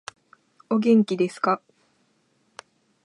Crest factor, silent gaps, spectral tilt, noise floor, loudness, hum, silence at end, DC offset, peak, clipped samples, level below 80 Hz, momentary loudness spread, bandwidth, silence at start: 18 dB; none; -6.5 dB/octave; -67 dBFS; -22 LUFS; none; 1.5 s; under 0.1%; -8 dBFS; under 0.1%; -78 dBFS; 9 LU; 11 kHz; 0.7 s